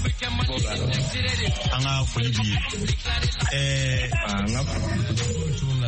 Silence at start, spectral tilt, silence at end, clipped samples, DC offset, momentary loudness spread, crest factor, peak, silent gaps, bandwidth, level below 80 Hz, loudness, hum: 0 s; -4.5 dB/octave; 0 s; under 0.1%; under 0.1%; 3 LU; 12 dB; -12 dBFS; none; 8.8 kHz; -32 dBFS; -25 LUFS; none